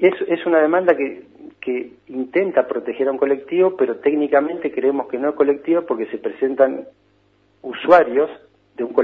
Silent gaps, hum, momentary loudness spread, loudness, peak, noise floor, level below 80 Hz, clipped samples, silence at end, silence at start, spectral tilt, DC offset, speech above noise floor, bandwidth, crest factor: none; none; 13 LU; -19 LUFS; 0 dBFS; -59 dBFS; -66 dBFS; under 0.1%; 0 s; 0 s; -7.5 dB/octave; under 0.1%; 40 dB; 5.2 kHz; 18 dB